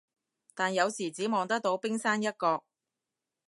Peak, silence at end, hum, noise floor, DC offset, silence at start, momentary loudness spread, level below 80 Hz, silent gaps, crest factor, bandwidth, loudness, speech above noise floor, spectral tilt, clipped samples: -12 dBFS; 0.9 s; none; -89 dBFS; under 0.1%; 0.55 s; 5 LU; -84 dBFS; none; 20 dB; 11.5 kHz; -30 LUFS; 59 dB; -3.5 dB/octave; under 0.1%